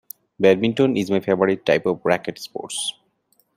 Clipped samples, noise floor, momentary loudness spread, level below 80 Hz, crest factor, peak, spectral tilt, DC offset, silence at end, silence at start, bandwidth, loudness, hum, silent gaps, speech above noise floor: under 0.1%; -65 dBFS; 11 LU; -64 dBFS; 20 dB; -2 dBFS; -5 dB/octave; under 0.1%; 0.65 s; 0.4 s; 16 kHz; -20 LUFS; none; none; 45 dB